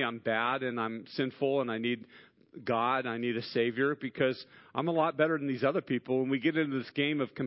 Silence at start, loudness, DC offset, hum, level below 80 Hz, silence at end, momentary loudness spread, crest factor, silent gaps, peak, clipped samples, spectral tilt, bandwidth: 0 s; -31 LUFS; under 0.1%; none; -76 dBFS; 0 s; 6 LU; 18 dB; none; -14 dBFS; under 0.1%; -9.5 dB/octave; 5.8 kHz